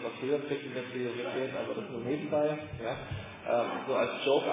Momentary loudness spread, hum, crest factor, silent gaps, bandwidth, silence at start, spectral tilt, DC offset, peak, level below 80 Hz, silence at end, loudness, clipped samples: 8 LU; none; 16 dB; none; 3.9 kHz; 0 s; -4 dB/octave; under 0.1%; -16 dBFS; -60 dBFS; 0 s; -33 LUFS; under 0.1%